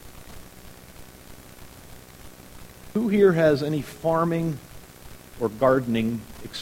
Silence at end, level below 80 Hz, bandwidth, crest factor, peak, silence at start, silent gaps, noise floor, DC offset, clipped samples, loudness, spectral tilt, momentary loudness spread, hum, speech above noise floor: 0 s; -50 dBFS; 16.5 kHz; 20 dB; -6 dBFS; 0.05 s; none; -45 dBFS; 0.2%; under 0.1%; -23 LUFS; -7 dB/octave; 26 LU; none; 23 dB